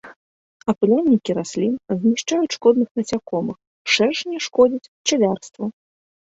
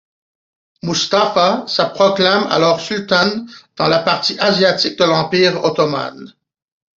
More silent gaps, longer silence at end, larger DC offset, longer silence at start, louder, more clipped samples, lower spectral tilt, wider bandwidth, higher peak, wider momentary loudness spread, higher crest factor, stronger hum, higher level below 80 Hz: first, 0.16-0.60 s, 2.91-2.95 s, 3.67-3.85 s, 4.88-5.05 s vs none; second, 0.5 s vs 0.7 s; neither; second, 0.05 s vs 0.85 s; second, -20 LUFS vs -15 LUFS; neither; about the same, -4.5 dB/octave vs -4 dB/octave; about the same, 8 kHz vs 7.8 kHz; about the same, -2 dBFS vs 0 dBFS; first, 11 LU vs 7 LU; about the same, 18 dB vs 16 dB; neither; about the same, -60 dBFS vs -58 dBFS